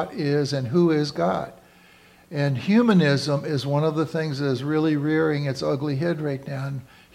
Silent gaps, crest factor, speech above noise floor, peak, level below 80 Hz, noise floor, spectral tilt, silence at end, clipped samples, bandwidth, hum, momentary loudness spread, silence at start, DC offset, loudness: none; 16 dB; 30 dB; -8 dBFS; -62 dBFS; -53 dBFS; -7 dB/octave; 0.3 s; under 0.1%; 13 kHz; none; 11 LU; 0 s; under 0.1%; -23 LUFS